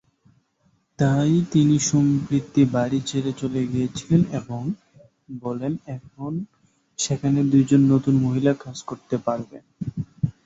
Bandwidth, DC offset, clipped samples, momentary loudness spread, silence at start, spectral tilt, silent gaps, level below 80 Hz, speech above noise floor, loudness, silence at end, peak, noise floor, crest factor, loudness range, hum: 8 kHz; under 0.1%; under 0.1%; 16 LU; 1 s; -6.5 dB/octave; none; -54 dBFS; 44 dB; -22 LUFS; 0.15 s; -6 dBFS; -65 dBFS; 18 dB; 6 LU; none